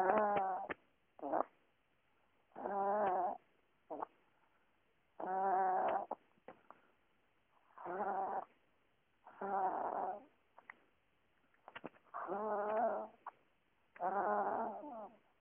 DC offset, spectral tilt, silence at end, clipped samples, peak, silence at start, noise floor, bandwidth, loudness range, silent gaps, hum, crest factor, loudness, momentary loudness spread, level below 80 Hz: under 0.1%; 0.5 dB/octave; 0.3 s; under 0.1%; -18 dBFS; 0 s; -79 dBFS; 3.5 kHz; 5 LU; none; none; 24 dB; -40 LUFS; 20 LU; -84 dBFS